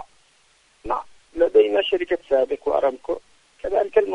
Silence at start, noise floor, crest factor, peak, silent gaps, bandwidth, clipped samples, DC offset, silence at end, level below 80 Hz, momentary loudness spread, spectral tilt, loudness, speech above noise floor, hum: 0 s; -59 dBFS; 18 dB; -4 dBFS; none; 9.4 kHz; under 0.1%; under 0.1%; 0 s; -52 dBFS; 14 LU; -4.5 dB/octave; -22 LUFS; 38 dB; none